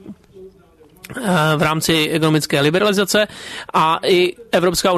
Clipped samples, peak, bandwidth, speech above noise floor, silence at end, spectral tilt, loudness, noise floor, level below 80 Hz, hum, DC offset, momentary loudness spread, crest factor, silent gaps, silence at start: under 0.1%; -6 dBFS; 13.5 kHz; 32 dB; 0 s; -4.5 dB/octave; -16 LUFS; -49 dBFS; -48 dBFS; none; under 0.1%; 7 LU; 12 dB; none; 0.05 s